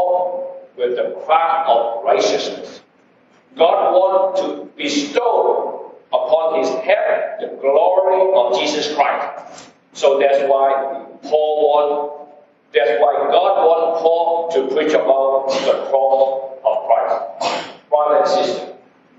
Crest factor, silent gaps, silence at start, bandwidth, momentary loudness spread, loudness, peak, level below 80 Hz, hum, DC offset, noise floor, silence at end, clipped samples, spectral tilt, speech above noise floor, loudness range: 16 dB; none; 0 s; 8 kHz; 11 LU; -16 LUFS; -2 dBFS; -76 dBFS; none; under 0.1%; -53 dBFS; 0.45 s; under 0.1%; -3 dB/octave; 37 dB; 2 LU